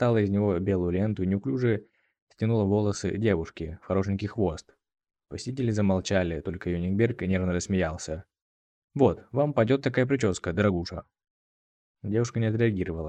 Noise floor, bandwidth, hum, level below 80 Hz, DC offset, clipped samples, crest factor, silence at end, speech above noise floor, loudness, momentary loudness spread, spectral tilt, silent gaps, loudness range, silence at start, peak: under -90 dBFS; 9.4 kHz; none; -50 dBFS; under 0.1%; under 0.1%; 18 dB; 0 s; over 64 dB; -27 LUFS; 12 LU; -7 dB/octave; 2.22-2.27 s, 8.42-8.88 s, 11.30-11.95 s; 2 LU; 0 s; -8 dBFS